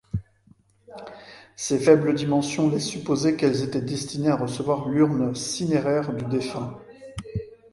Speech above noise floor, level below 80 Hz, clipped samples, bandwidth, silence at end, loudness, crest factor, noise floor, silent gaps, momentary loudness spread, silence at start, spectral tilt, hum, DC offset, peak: 35 dB; -52 dBFS; under 0.1%; 11.5 kHz; 0.2 s; -24 LUFS; 22 dB; -58 dBFS; none; 20 LU; 0.15 s; -5.5 dB/octave; none; under 0.1%; -2 dBFS